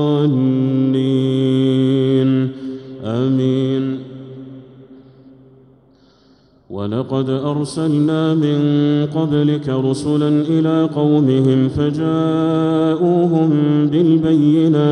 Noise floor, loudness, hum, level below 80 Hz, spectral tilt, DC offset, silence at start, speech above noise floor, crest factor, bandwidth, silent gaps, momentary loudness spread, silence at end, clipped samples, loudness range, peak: -51 dBFS; -16 LUFS; none; -52 dBFS; -8.5 dB/octave; under 0.1%; 0 s; 37 dB; 12 dB; 10.5 kHz; none; 10 LU; 0 s; under 0.1%; 10 LU; -4 dBFS